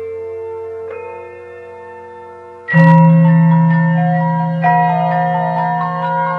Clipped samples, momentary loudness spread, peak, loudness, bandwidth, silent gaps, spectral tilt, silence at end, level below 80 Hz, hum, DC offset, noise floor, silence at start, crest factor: under 0.1%; 24 LU; 0 dBFS; -12 LUFS; 4.1 kHz; none; -10.5 dB/octave; 0 s; -66 dBFS; 60 Hz at -60 dBFS; under 0.1%; -34 dBFS; 0 s; 14 dB